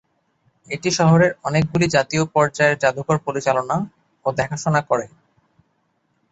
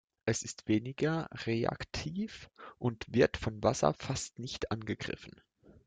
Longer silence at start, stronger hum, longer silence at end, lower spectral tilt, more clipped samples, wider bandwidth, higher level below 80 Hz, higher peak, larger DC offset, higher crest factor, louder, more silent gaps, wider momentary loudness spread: first, 0.7 s vs 0.25 s; neither; first, 1.25 s vs 0.15 s; about the same, -5.5 dB/octave vs -5 dB/octave; neither; second, 8.2 kHz vs 9.6 kHz; about the same, -54 dBFS vs -56 dBFS; first, -2 dBFS vs -12 dBFS; neither; second, 18 dB vs 24 dB; first, -19 LUFS vs -34 LUFS; neither; second, 9 LU vs 12 LU